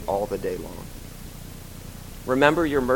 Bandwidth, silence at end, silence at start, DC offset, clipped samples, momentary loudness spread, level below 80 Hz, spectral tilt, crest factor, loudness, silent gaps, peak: 17.5 kHz; 0 s; 0 s; under 0.1%; under 0.1%; 21 LU; -42 dBFS; -5.5 dB/octave; 24 dB; -23 LUFS; none; -2 dBFS